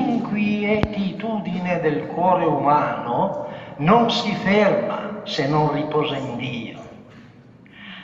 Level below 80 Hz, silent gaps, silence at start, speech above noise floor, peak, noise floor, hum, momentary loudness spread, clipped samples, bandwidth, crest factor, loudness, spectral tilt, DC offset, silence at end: -48 dBFS; none; 0 s; 26 dB; 0 dBFS; -46 dBFS; none; 13 LU; under 0.1%; 7.8 kHz; 22 dB; -21 LUFS; -6.5 dB/octave; under 0.1%; 0 s